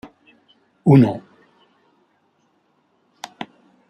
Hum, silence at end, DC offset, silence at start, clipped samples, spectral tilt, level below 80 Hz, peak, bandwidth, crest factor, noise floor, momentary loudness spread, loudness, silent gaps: none; 0.45 s; under 0.1%; 0.85 s; under 0.1%; -9 dB/octave; -62 dBFS; -2 dBFS; 8.6 kHz; 20 dB; -64 dBFS; 25 LU; -16 LUFS; none